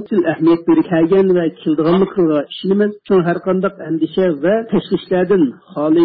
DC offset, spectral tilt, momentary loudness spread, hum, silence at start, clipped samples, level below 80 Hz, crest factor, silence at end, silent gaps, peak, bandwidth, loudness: under 0.1%; -12.5 dB/octave; 6 LU; none; 0 s; under 0.1%; -52 dBFS; 10 dB; 0 s; none; -6 dBFS; 5 kHz; -15 LUFS